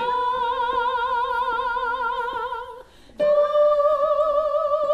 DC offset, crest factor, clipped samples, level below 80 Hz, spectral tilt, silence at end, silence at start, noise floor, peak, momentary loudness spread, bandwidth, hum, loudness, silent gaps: under 0.1%; 12 dB; under 0.1%; -52 dBFS; -4 dB/octave; 0 s; 0 s; -43 dBFS; -10 dBFS; 9 LU; 7.8 kHz; none; -22 LUFS; none